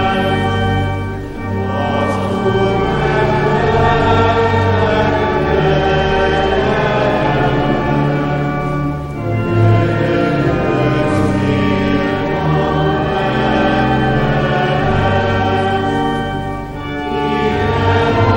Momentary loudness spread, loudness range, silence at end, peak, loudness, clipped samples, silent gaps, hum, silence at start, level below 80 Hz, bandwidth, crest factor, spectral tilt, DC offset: 6 LU; 3 LU; 0 s; -2 dBFS; -15 LUFS; under 0.1%; none; none; 0 s; -28 dBFS; 16.5 kHz; 12 dB; -7.5 dB/octave; under 0.1%